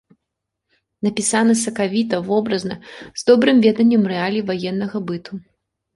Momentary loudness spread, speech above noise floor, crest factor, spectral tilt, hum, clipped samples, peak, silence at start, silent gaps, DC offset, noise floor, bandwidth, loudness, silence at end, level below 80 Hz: 16 LU; 62 dB; 18 dB; -4.5 dB/octave; none; under 0.1%; -2 dBFS; 1.05 s; none; under 0.1%; -79 dBFS; 11.5 kHz; -18 LUFS; 0.55 s; -60 dBFS